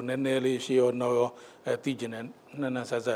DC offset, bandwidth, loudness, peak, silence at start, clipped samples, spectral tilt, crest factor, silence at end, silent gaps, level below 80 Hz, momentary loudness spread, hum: under 0.1%; 14.5 kHz; -29 LUFS; -14 dBFS; 0 s; under 0.1%; -5.5 dB/octave; 16 dB; 0 s; none; -78 dBFS; 13 LU; none